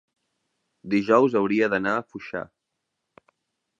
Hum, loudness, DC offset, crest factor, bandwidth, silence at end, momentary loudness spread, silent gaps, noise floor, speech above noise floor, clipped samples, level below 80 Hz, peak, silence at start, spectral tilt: none; -23 LUFS; under 0.1%; 22 dB; 7.6 kHz; 1.35 s; 15 LU; none; -81 dBFS; 58 dB; under 0.1%; -66 dBFS; -4 dBFS; 0.85 s; -7 dB/octave